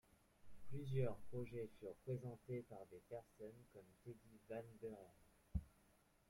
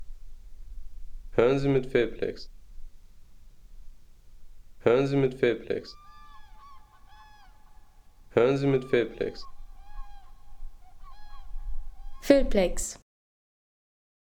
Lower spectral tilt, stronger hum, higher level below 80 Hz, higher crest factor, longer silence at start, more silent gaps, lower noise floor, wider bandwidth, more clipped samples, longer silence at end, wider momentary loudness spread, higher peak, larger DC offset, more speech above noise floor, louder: first, -8.5 dB/octave vs -6 dB/octave; neither; second, -64 dBFS vs -42 dBFS; about the same, 20 dB vs 24 dB; first, 0.45 s vs 0 s; neither; first, -76 dBFS vs -52 dBFS; second, 16 kHz vs 18 kHz; neither; second, 0.6 s vs 1.35 s; second, 15 LU vs 26 LU; second, -30 dBFS vs -6 dBFS; neither; about the same, 26 dB vs 27 dB; second, -52 LUFS vs -26 LUFS